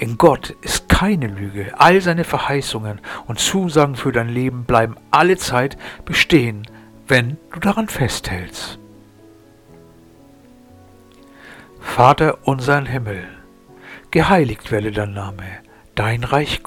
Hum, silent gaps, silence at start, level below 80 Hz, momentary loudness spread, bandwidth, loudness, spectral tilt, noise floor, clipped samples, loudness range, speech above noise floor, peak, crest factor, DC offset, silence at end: none; none; 0 s; -36 dBFS; 17 LU; 18.5 kHz; -17 LUFS; -5 dB/octave; -46 dBFS; under 0.1%; 8 LU; 29 dB; 0 dBFS; 18 dB; under 0.1%; 0.05 s